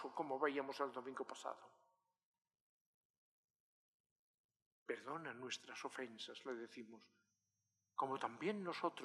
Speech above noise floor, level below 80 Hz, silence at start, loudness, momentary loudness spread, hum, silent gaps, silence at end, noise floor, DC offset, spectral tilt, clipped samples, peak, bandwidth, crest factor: 43 dB; under -90 dBFS; 0 s; -47 LUFS; 13 LU; 50 Hz at -90 dBFS; 2.25-2.34 s, 2.61-3.54 s, 3.60-4.49 s, 4.62-4.86 s; 0 s; -89 dBFS; under 0.1%; -4 dB/octave; under 0.1%; -24 dBFS; 13 kHz; 24 dB